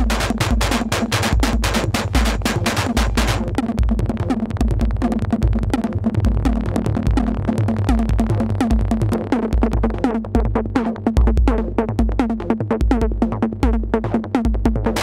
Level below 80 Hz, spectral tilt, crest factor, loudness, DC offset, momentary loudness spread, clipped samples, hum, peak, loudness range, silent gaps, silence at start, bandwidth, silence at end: -22 dBFS; -6 dB/octave; 14 dB; -19 LUFS; 0.1%; 2 LU; under 0.1%; none; -2 dBFS; 1 LU; none; 0 s; 15.5 kHz; 0 s